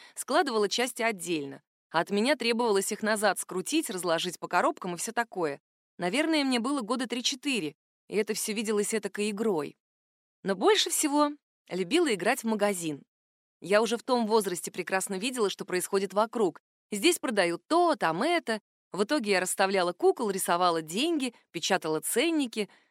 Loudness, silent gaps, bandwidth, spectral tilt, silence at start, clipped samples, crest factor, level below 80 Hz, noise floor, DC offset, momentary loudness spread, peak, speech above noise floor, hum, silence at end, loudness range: -28 LUFS; 1.67-1.90 s, 5.60-5.98 s, 7.75-8.08 s, 9.80-10.43 s, 11.43-11.65 s, 13.08-13.60 s, 16.60-16.90 s, 18.61-18.91 s; 16 kHz; -3 dB/octave; 0 s; under 0.1%; 20 dB; -86 dBFS; under -90 dBFS; under 0.1%; 8 LU; -10 dBFS; over 62 dB; none; 0.25 s; 3 LU